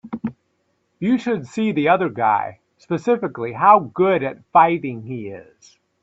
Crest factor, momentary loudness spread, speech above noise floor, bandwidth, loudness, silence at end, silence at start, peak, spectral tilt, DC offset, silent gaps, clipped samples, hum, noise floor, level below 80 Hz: 20 dB; 16 LU; 49 dB; 7.8 kHz; -19 LUFS; 0.6 s; 0.05 s; 0 dBFS; -7.5 dB/octave; under 0.1%; none; under 0.1%; none; -68 dBFS; -64 dBFS